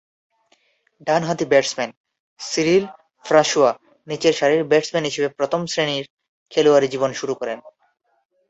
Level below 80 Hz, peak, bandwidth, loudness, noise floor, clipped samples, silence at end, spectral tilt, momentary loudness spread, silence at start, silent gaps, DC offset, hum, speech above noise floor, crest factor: -64 dBFS; -2 dBFS; 8.2 kHz; -20 LUFS; -62 dBFS; under 0.1%; 0.8 s; -4 dB/octave; 15 LU; 1.05 s; 1.97-2.04 s, 2.20-2.36 s, 6.10-6.17 s, 6.28-6.46 s; under 0.1%; none; 43 dB; 18 dB